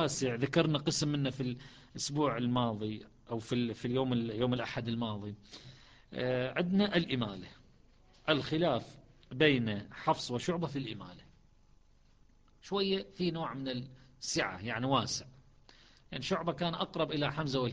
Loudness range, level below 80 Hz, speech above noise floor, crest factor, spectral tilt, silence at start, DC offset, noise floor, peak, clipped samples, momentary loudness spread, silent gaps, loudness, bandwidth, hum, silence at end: 5 LU; -60 dBFS; 30 dB; 22 dB; -5 dB/octave; 0 s; under 0.1%; -63 dBFS; -14 dBFS; under 0.1%; 16 LU; none; -34 LUFS; 10 kHz; none; 0 s